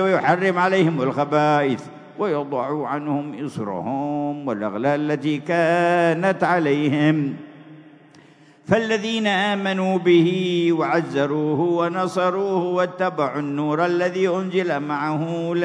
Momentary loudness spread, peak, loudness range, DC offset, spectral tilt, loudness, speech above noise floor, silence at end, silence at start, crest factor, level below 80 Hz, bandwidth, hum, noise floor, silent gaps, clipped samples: 8 LU; -2 dBFS; 4 LU; under 0.1%; -6.5 dB/octave; -21 LUFS; 29 dB; 0 s; 0 s; 18 dB; -70 dBFS; 10.5 kHz; none; -50 dBFS; none; under 0.1%